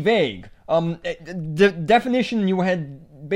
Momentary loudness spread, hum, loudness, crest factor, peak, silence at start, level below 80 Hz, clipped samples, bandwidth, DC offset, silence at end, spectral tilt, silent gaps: 13 LU; none; -21 LUFS; 18 dB; -4 dBFS; 0 s; -52 dBFS; under 0.1%; 11.5 kHz; under 0.1%; 0 s; -6.5 dB/octave; none